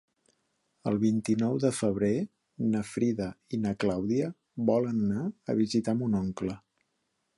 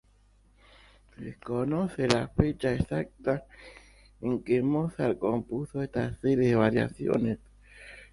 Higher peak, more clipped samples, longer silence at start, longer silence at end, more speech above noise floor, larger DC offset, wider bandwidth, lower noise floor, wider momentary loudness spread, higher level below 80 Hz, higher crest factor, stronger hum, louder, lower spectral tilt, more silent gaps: second, -12 dBFS vs -2 dBFS; neither; second, 0.85 s vs 1.2 s; first, 0.8 s vs 0.1 s; first, 50 dB vs 34 dB; neither; about the same, 11.5 kHz vs 11.5 kHz; first, -78 dBFS vs -62 dBFS; second, 8 LU vs 18 LU; second, -60 dBFS vs -48 dBFS; second, 18 dB vs 28 dB; second, none vs 50 Hz at -55 dBFS; about the same, -30 LUFS vs -29 LUFS; about the same, -7 dB/octave vs -7 dB/octave; neither